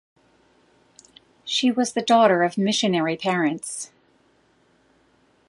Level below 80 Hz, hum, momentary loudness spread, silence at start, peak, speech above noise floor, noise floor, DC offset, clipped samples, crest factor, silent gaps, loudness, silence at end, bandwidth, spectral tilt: -74 dBFS; none; 15 LU; 1.45 s; -2 dBFS; 41 dB; -61 dBFS; under 0.1%; under 0.1%; 22 dB; none; -21 LUFS; 1.65 s; 11.5 kHz; -4 dB/octave